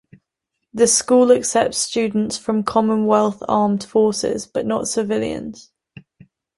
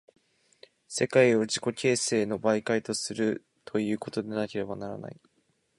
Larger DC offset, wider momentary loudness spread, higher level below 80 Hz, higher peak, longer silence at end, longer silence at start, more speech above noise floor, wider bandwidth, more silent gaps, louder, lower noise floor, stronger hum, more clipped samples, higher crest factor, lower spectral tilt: neither; second, 9 LU vs 14 LU; first, -56 dBFS vs -68 dBFS; first, -2 dBFS vs -8 dBFS; first, 0.95 s vs 0.65 s; second, 0.75 s vs 0.9 s; first, 61 dB vs 44 dB; about the same, 11.5 kHz vs 11.5 kHz; neither; first, -18 LUFS vs -28 LUFS; first, -78 dBFS vs -72 dBFS; neither; neither; about the same, 18 dB vs 22 dB; about the same, -4 dB/octave vs -4 dB/octave